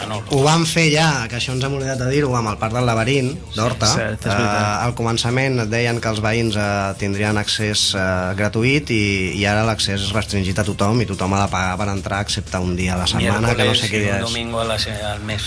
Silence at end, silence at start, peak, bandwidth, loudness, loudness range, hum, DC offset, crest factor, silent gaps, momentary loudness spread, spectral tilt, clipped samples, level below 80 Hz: 0 s; 0 s; -2 dBFS; 11 kHz; -19 LUFS; 1 LU; none; under 0.1%; 16 dB; none; 6 LU; -4.5 dB/octave; under 0.1%; -38 dBFS